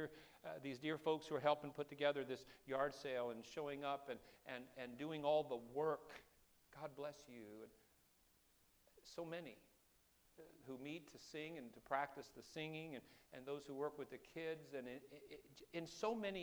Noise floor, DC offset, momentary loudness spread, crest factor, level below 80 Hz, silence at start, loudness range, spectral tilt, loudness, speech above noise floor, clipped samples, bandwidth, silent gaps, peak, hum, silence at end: -76 dBFS; under 0.1%; 18 LU; 24 dB; -80 dBFS; 0 s; 12 LU; -5 dB/octave; -47 LUFS; 29 dB; under 0.1%; over 20 kHz; none; -24 dBFS; none; 0 s